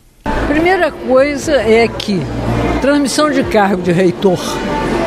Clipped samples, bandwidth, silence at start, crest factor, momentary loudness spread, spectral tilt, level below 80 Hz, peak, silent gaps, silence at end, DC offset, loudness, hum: under 0.1%; 15.5 kHz; 0.25 s; 12 dB; 6 LU; -5.5 dB/octave; -28 dBFS; 0 dBFS; none; 0 s; under 0.1%; -13 LUFS; none